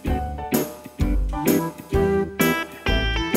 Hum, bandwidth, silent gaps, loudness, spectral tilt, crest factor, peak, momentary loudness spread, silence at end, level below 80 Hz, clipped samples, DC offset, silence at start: none; 16 kHz; none; -23 LUFS; -5 dB/octave; 16 dB; -6 dBFS; 6 LU; 0 s; -28 dBFS; under 0.1%; under 0.1%; 0 s